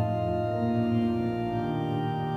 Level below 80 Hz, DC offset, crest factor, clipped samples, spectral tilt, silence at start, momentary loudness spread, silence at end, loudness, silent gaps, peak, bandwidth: -52 dBFS; under 0.1%; 10 dB; under 0.1%; -9.5 dB/octave; 0 s; 3 LU; 0 s; -28 LUFS; none; -16 dBFS; 6.6 kHz